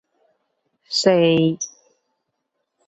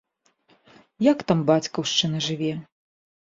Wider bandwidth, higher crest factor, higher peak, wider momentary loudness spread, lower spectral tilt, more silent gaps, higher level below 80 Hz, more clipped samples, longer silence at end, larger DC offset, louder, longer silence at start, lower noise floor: about the same, 8.2 kHz vs 7.8 kHz; about the same, 20 dB vs 20 dB; about the same, -2 dBFS vs -4 dBFS; first, 14 LU vs 8 LU; about the same, -4.5 dB/octave vs -5 dB/octave; neither; about the same, -64 dBFS vs -64 dBFS; neither; first, 1.2 s vs 0.65 s; neither; first, -18 LUFS vs -23 LUFS; about the same, 0.9 s vs 1 s; first, -76 dBFS vs -64 dBFS